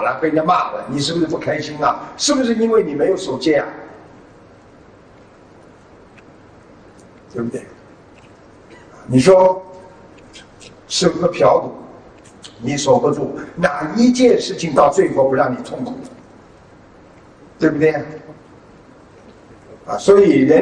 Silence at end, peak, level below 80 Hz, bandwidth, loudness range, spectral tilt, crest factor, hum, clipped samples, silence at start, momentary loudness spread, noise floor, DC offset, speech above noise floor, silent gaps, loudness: 0 s; 0 dBFS; -52 dBFS; 10 kHz; 18 LU; -5 dB/octave; 18 dB; none; under 0.1%; 0 s; 17 LU; -45 dBFS; under 0.1%; 29 dB; none; -16 LUFS